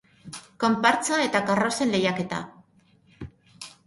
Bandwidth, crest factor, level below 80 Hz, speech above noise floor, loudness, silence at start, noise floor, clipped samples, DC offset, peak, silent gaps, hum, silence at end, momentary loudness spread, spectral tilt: 11.5 kHz; 22 dB; -60 dBFS; 37 dB; -24 LUFS; 0.25 s; -60 dBFS; under 0.1%; under 0.1%; -4 dBFS; none; none; 0.2 s; 23 LU; -4 dB/octave